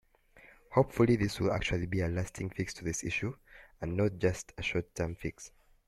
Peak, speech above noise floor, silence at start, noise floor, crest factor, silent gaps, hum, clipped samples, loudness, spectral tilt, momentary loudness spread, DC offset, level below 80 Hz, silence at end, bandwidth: -12 dBFS; 28 dB; 0.45 s; -60 dBFS; 22 dB; none; none; under 0.1%; -33 LUFS; -5.5 dB/octave; 13 LU; under 0.1%; -52 dBFS; 0.4 s; 14 kHz